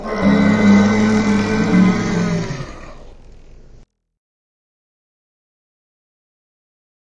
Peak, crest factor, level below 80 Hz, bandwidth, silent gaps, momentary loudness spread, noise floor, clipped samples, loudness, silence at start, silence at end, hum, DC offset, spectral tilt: -2 dBFS; 16 dB; -38 dBFS; 8 kHz; none; 13 LU; -45 dBFS; under 0.1%; -15 LUFS; 0 s; 3.9 s; none; under 0.1%; -6.5 dB/octave